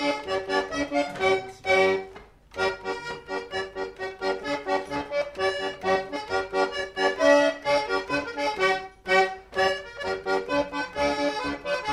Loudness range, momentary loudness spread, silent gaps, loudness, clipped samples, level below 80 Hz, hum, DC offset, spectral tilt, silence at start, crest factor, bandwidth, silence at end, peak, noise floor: 6 LU; 10 LU; none; -26 LUFS; under 0.1%; -54 dBFS; none; under 0.1%; -3.5 dB/octave; 0 s; 18 dB; 13 kHz; 0 s; -8 dBFS; -47 dBFS